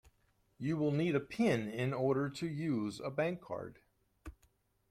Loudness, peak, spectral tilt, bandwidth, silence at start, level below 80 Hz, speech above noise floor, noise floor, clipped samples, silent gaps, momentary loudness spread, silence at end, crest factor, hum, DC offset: -36 LUFS; -18 dBFS; -7 dB/octave; 14 kHz; 0.6 s; -66 dBFS; 39 dB; -74 dBFS; under 0.1%; none; 20 LU; 0.6 s; 18 dB; none; under 0.1%